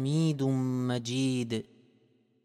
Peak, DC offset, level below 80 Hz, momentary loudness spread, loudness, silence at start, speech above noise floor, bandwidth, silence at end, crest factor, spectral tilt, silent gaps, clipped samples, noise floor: -18 dBFS; under 0.1%; -72 dBFS; 6 LU; -30 LUFS; 0 s; 38 dB; 13 kHz; 0.85 s; 12 dB; -6.5 dB/octave; none; under 0.1%; -67 dBFS